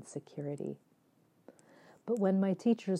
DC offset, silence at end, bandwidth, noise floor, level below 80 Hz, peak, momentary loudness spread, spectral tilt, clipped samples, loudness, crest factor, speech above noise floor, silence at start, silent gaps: under 0.1%; 0 s; 10.5 kHz; -70 dBFS; -90 dBFS; -18 dBFS; 17 LU; -8 dB/octave; under 0.1%; -34 LUFS; 16 dB; 37 dB; 0 s; none